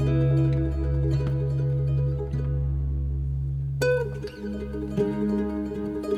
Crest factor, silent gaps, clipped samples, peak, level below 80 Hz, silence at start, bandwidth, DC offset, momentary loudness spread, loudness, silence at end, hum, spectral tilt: 14 dB; none; under 0.1%; -12 dBFS; -32 dBFS; 0 s; 8.6 kHz; under 0.1%; 8 LU; -27 LUFS; 0 s; none; -8.5 dB/octave